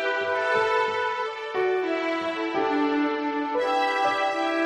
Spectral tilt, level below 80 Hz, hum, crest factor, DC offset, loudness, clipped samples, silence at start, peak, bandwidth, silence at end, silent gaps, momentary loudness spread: -3.5 dB/octave; -68 dBFS; none; 14 dB; under 0.1%; -25 LUFS; under 0.1%; 0 s; -12 dBFS; 12 kHz; 0 s; none; 4 LU